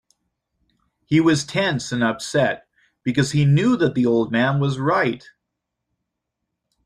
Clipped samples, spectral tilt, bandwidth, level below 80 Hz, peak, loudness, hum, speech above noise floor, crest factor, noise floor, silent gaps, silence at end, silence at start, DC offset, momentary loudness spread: under 0.1%; -6 dB/octave; 11 kHz; -56 dBFS; -4 dBFS; -20 LUFS; none; 61 dB; 16 dB; -80 dBFS; none; 1.7 s; 1.1 s; under 0.1%; 7 LU